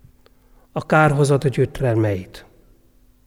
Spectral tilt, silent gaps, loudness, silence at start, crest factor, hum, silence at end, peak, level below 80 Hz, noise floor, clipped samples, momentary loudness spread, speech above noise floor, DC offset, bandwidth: -7 dB/octave; none; -19 LUFS; 0.75 s; 18 dB; none; 0.85 s; -2 dBFS; -44 dBFS; -54 dBFS; under 0.1%; 15 LU; 36 dB; under 0.1%; 14.5 kHz